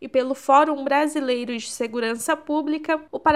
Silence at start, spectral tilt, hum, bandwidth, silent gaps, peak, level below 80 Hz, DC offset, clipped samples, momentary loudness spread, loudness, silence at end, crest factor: 0 s; -3 dB/octave; none; 15.5 kHz; none; -4 dBFS; -58 dBFS; 0.1%; under 0.1%; 9 LU; -22 LUFS; 0 s; 16 dB